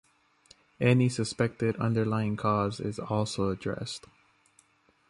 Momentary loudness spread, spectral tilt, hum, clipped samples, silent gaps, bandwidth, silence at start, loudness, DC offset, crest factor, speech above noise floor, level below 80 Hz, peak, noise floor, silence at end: 10 LU; -6.5 dB/octave; none; under 0.1%; none; 11.5 kHz; 0.8 s; -29 LUFS; under 0.1%; 20 dB; 37 dB; -58 dBFS; -10 dBFS; -65 dBFS; 1.1 s